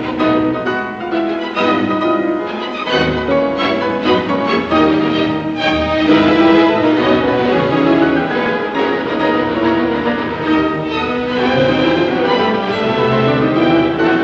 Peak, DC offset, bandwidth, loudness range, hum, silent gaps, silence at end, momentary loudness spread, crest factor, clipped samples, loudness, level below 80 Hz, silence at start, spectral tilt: -2 dBFS; under 0.1%; 7.2 kHz; 3 LU; none; none; 0 s; 6 LU; 14 dB; under 0.1%; -14 LUFS; -40 dBFS; 0 s; -7 dB/octave